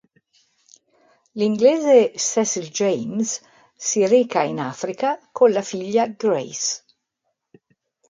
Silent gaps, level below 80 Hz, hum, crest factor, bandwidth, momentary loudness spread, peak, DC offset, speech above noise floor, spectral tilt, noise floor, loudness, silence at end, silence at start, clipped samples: none; -72 dBFS; none; 18 dB; 9.6 kHz; 11 LU; -2 dBFS; under 0.1%; 57 dB; -3.5 dB/octave; -77 dBFS; -20 LUFS; 1.35 s; 1.35 s; under 0.1%